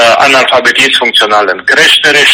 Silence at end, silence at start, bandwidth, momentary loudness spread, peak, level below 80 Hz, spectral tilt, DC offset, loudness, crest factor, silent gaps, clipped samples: 0 s; 0 s; over 20 kHz; 5 LU; 0 dBFS; -48 dBFS; -1 dB/octave; under 0.1%; -5 LUFS; 6 dB; none; 2%